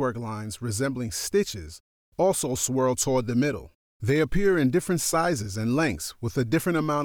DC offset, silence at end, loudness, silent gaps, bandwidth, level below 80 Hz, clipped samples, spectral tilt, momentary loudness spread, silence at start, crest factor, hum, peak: under 0.1%; 0 s; -26 LUFS; 1.80-2.12 s, 3.75-4.00 s; 19.5 kHz; -46 dBFS; under 0.1%; -5 dB/octave; 10 LU; 0 s; 14 dB; none; -12 dBFS